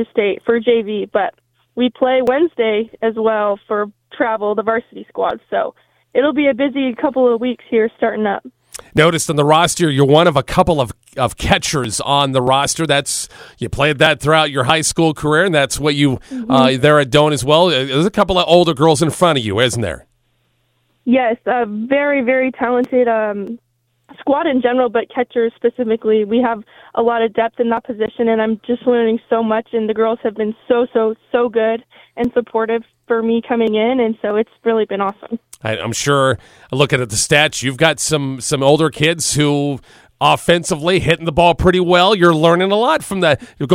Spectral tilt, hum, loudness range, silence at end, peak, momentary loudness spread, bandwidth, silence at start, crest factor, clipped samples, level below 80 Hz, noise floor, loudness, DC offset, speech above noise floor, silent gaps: -4.5 dB/octave; none; 5 LU; 0 s; 0 dBFS; 9 LU; 16 kHz; 0 s; 16 dB; under 0.1%; -42 dBFS; -62 dBFS; -15 LUFS; under 0.1%; 47 dB; none